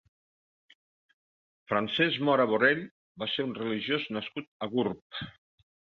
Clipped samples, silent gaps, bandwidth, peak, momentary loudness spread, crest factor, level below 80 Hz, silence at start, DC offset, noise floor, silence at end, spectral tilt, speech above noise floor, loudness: under 0.1%; 2.91-3.15 s, 4.47-4.60 s, 5.02-5.10 s; 6.8 kHz; -10 dBFS; 15 LU; 22 dB; -70 dBFS; 1.7 s; under 0.1%; under -90 dBFS; 0.65 s; -7 dB/octave; over 61 dB; -29 LUFS